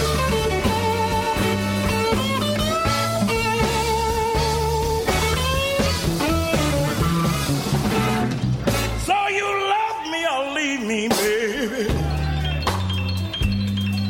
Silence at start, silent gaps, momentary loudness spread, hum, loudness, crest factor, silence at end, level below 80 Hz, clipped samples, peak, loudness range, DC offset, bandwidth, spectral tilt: 0 s; none; 3 LU; none; -21 LUFS; 14 dB; 0 s; -32 dBFS; under 0.1%; -8 dBFS; 2 LU; under 0.1%; 16.5 kHz; -4.5 dB/octave